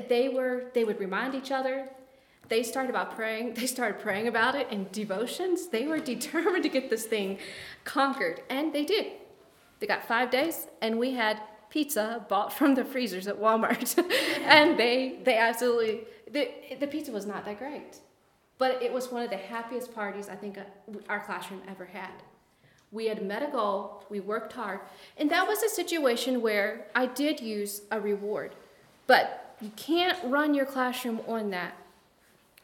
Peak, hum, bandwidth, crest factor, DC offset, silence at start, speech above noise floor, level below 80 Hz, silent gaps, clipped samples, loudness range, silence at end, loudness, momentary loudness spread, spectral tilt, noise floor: -2 dBFS; none; 18 kHz; 28 dB; under 0.1%; 0 s; 37 dB; -76 dBFS; none; under 0.1%; 10 LU; 0.8 s; -29 LUFS; 14 LU; -3 dB/octave; -66 dBFS